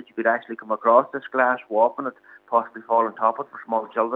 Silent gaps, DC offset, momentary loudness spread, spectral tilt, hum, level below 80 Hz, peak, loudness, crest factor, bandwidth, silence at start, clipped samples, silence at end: none; under 0.1%; 10 LU; -7.5 dB/octave; none; -84 dBFS; -4 dBFS; -22 LUFS; 20 dB; 4 kHz; 0.15 s; under 0.1%; 0 s